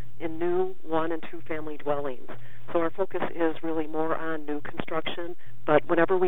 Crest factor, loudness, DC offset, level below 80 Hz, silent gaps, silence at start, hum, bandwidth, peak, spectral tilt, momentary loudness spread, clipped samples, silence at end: 22 dB; -29 LUFS; 6%; -68 dBFS; none; 0 s; none; over 20 kHz; -6 dBFS; -8 dB/octave; 12 LU; under 0.1%; 0 s